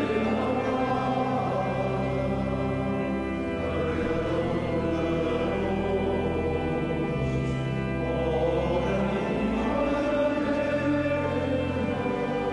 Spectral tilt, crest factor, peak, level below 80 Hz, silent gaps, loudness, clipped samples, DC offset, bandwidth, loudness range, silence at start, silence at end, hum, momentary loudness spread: -7.5 dB/octave; 12 dB; -14 dBFS; -40 dBFS; none; -27 LUFS; under 0.1%; under 0.1%; 11.5 kHz; 2 LU; 0 s; 0 s; none; 3 LU